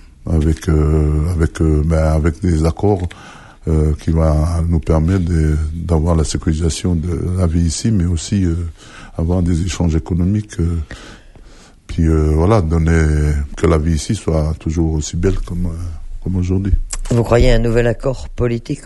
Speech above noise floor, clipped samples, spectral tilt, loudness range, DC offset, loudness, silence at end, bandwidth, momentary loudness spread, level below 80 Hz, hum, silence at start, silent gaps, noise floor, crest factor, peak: 26 dB; under 0.1%; -7 dB/octave; 3 LU; under 0.1%; -17 LUFS; 0 s; 11.5 kHz; 9 LU; -22 dBFS; none; 0.2 s; none; -41 dBFS; 16 dB; 0 dBFS